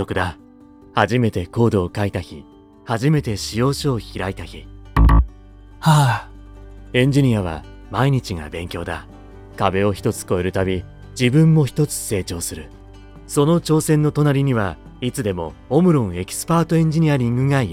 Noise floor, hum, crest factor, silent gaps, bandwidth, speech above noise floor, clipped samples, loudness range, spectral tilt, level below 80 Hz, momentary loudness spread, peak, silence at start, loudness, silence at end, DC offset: -45 dBFS; none; 18 dB; none; 16 kHz; 27 dB; under 0.1%; 3 LU; -6 dB/octave; -30 dBFS; 13 LU; -2 dBFS; 0 s; -19 LUFS; 0 s; under 0.1%